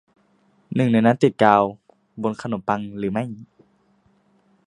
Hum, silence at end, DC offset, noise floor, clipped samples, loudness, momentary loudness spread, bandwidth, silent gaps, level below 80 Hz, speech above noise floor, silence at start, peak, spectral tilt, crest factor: none; 1.2 s; under 0.1%; -61 dBFS; under 0.1%; -21 LUFS; 12 LU; 10.5 kHz; none; -60 dBFS; 42 dB; 0.7 s; 0 dBFS; -7.5 dB/octave; 22 dB